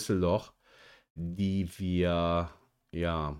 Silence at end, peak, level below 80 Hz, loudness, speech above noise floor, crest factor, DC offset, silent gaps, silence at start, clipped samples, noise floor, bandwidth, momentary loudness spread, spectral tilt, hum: 0 s; -16 dBFS; -48 dBFS; -31 LUFS; 29 dB; 16 dB; under 0.1%; 1.10-1.15 s; 0 s; under 0.1%; -59 dBFS; 15.5 kHz; 13 LU; -6.5 dB/octave; none